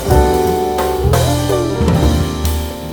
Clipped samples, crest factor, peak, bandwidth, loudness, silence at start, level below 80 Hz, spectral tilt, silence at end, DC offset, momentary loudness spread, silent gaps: under 0.1%; 14 dB; 0 dBFS; over 20 kHz; -15 LUFS; 0 s; -20 dBFS; -6 dB/octave; 0 s; under 0.1%; 5 LU; none